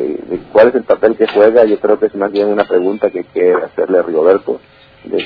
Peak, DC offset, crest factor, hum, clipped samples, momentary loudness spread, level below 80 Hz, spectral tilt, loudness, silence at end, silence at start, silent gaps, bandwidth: 0 dBFS; under 0.1%; 12 dB; none; 0.4%; 9 LU; -54 dBFS; -8.5 dB/octave; -13 LUFS; 0 s; 0 s; none; 5.4 kHz